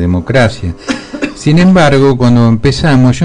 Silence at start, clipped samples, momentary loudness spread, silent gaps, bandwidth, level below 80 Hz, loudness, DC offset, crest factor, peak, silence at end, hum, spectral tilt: 0 s; under 0.1%; 13 LU; none; 10.5 kHz; -28 dBFS; -9 LUFS; under 0.1%; 8 dB; 0 dBFS; 0 s; none; -7 dB/octave